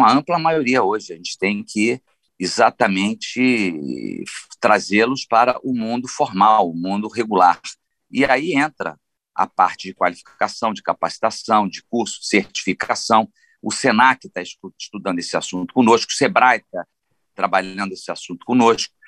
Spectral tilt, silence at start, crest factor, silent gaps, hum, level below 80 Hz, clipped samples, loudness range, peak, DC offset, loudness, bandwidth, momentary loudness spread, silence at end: -4 dB/octave; 0 s; 18 dB; none; none; -62 dBFS; under 0.1%; 3 LU; -2 dBFS; under 0.1%; -18 LUFS; 11.5 kHz; 14 LU; 0.2 s